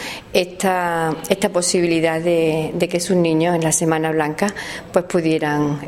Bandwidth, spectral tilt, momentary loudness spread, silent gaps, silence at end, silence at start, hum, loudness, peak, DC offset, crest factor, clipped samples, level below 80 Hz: 16.5 kHz; -4.5 dB/octave; 5 LU; none; 0 s; 0 s; none; -18 LUFS; 0 dBFS; under 0.1%; 18 dB; under 0.1%; -50 dBFS